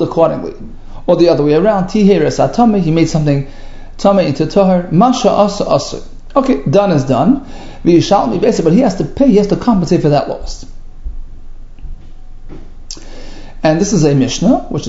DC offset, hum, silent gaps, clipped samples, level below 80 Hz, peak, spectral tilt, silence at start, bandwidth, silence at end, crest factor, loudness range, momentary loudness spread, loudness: under 0.1%; none; none; under 0.1%; -28 dBFS; 0 dBFS; -6.5 dB/octave; 0 s; 8 kHz; 0 s; 12 dB; 7 LU; 19 LU; -12 LUFS